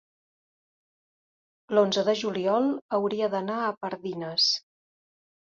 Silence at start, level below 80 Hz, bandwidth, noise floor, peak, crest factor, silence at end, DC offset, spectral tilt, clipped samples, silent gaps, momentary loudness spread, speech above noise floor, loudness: 1.7 s; -76 dBFS; 7.6 kHz; under -90 dBFS; -10 dBFS; 18 dB; 0.85 s; under 0.1%; -4 dB/octave; under 0.1%; 2.82-2.89 s; 8 LU; over 64 dB; -26 LUFS